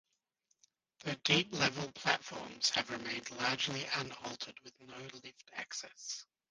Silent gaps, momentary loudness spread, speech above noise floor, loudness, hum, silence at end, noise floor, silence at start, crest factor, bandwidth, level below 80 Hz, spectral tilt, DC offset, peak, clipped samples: none; 18 LU; 42 dB; -36 LUFS; none; 0.25 s; -81 dBFS; 1 s; 26 dB; 10 kHz; -74 dBFS; -2.5 dB/octave; under 0.1%; -12 dBFS; under 0.1%